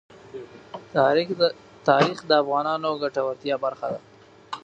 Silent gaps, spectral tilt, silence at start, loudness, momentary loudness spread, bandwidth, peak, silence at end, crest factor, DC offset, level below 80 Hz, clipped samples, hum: none; -5.5 dB/octave; 0.35 s; -23 LUFS; 20 LU; 9 kHz; -2 dBFS; 0.05 s; 22 dB; under 0.1%; -68 dBFS; under 0.1%; none